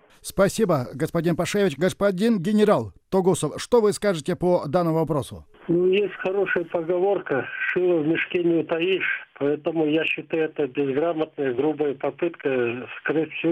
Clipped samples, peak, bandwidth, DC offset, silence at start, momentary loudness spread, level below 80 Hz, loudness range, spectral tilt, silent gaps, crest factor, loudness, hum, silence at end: under 0.1%; -8 dBFS; 16 kHz; under 0.1%; 0.25 s; 6 LU; -54 dBFS; 3 LU; -6 dB/octave; none; 16 dB; -23 LUFS; none; 0 s